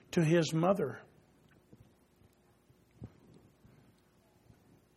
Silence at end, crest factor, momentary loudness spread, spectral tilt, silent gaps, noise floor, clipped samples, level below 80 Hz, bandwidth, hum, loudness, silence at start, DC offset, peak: 1.9 s; 22 dB; 25 LU; -6.5 dB/octave; none; -67 dBFS; under 0.1%; -70 dBFS; 14 kHz; none; -31 LUFS; 0.15 s; under 0.1%; -14 dBFS